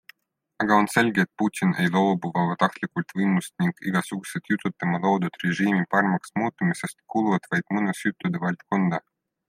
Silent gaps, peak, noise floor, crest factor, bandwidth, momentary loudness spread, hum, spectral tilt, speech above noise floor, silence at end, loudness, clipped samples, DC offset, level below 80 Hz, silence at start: none; -4 dBFS; -64 dBFS; 20 dB; 15.5 kHz; 7 LU; none; -6 dB/octave; 40 dB; 0.5 s; -24 LUFS; under 0.1%; under 0.1%; -68 dBFS; 0.6 s